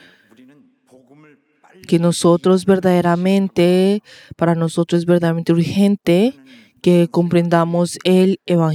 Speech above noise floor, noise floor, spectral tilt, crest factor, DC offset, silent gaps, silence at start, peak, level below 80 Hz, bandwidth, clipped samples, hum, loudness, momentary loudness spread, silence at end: 35 dB; -50 dBFS; -7 dB/octave; 16 dB; under 0.1%; none; 1.9 s; 0 dBFS; -58 dBFS; 13 kHz; under 0.1%; none; -16 LUFS; 4 LU; 0 s